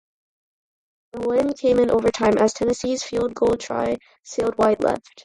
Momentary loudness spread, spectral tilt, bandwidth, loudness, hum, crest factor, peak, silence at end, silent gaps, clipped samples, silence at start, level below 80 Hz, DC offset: 8 LU; -5 dB/octave; 11.5 kHz; -21 LUFS; none; 16 dB; -6 dBFS; 0.25 s; none; under 0.1%; 1.15 s; -50 dBFS; under 0.1%